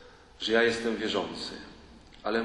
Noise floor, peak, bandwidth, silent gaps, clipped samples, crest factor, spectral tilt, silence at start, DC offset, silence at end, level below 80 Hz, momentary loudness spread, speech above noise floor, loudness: -52 dBFS; -10 dBFS; 11.5 kHz; none; under 0.1%; 20 dB; -3.5 dB/octave; 0 s; under 0.1%; 0 s; -58 dBFS; 16 LU; 23 dB; -29 LUFS